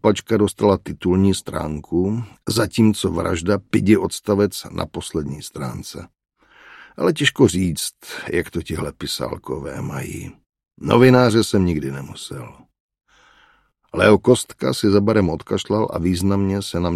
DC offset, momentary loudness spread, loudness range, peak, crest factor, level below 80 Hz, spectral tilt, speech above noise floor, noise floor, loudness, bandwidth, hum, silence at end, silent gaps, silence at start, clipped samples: under 0.1%; 15 LU; 4 LU; 0 dBFS; 18 dB; -44 dBFS; -5.5 dB/octave; 39 dB; -58 dBFS; -19 LUFS; 15 kHz; none; 0 s; 12.80-12.89 s; 0.05 s; under 0.1%